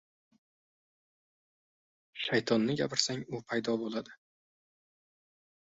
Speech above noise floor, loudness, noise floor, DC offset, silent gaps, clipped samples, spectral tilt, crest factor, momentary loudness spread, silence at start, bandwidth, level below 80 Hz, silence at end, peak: over 58 dB; -32 LUFS; under -90 dBFS; under 0.1%; none; under 0.1%; -4 dB/octave; 26 dB; 11 LU; 2.15 s; 8 kHz; -74 dBFS; 1.5 s; -10 dBFS